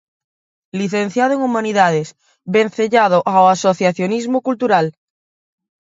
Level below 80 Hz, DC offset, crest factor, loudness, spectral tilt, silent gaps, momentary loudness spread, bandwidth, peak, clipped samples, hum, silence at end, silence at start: -66 dBFS; under 0.1%; 16 dB; -16 LUFS; -5.5 dB/octave; none; 10 LU; 7.8 kHz; 0 dBFS; under 0.1%; none; 1.05 s; 0.75 s